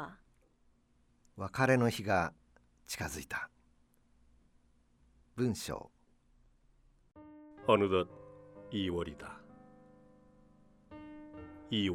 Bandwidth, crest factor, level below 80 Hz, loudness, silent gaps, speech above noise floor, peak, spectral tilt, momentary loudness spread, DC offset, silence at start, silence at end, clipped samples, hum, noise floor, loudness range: 16 kHz; 26 dB; -62 dBFS; -34 LUFS; none; 37 dB; -12 dBFS; -5.5 dB/octave; 25 LU; under 0.1%; 0 s; 0 s; under 0.1%; none; -70 dBFS; 9 LU